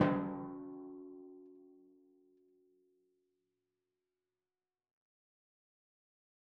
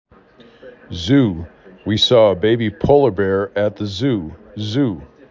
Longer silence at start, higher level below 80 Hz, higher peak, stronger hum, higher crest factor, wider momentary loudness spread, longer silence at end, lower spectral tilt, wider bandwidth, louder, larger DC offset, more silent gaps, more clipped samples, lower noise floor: second, 0 s vs 0.65 s; second, -76 dBFS vs -40 dBFS; second, -14 dBFS vs -2 dBFS; neither; first, 30 dB vs 16 dB; first, 23 LU vs 18 LU; first, 4.65 s vs 0.25 s; second, -5 dB/octave vs -6.5 dB/octave; second, 3.9 kHz vs 7.6 kHz; second, -42 LUFS vs -17 LUFS; neither; neither; neither; first, under -90 dBFS vs -47 dBFS